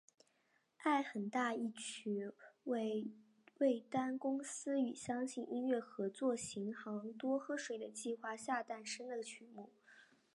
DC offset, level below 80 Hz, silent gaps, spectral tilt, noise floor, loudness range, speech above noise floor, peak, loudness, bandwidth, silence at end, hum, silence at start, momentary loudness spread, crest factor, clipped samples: under 0.1%; -86 dBFS; none; -4 dB/octave; -79 dBFS; 3 LU; 38 dB; -24 dBFS; -41 LUFS; 11.5 kHz; 0.3 s; none; 0.8 s; 9 LU; 18 dB; under 0.1%